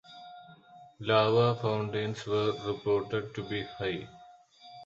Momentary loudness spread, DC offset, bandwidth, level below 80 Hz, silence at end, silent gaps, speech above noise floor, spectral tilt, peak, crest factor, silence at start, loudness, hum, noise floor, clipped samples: 18 LU; under 0.1%; 7.8 kHz; -64 dBFS; 0 s; none; 26 dB; -6.5 dB/octave; -12 dBFS; 20 dB; 0.1 s; -30 LUFS; none; -55 dBFS; under 0.1%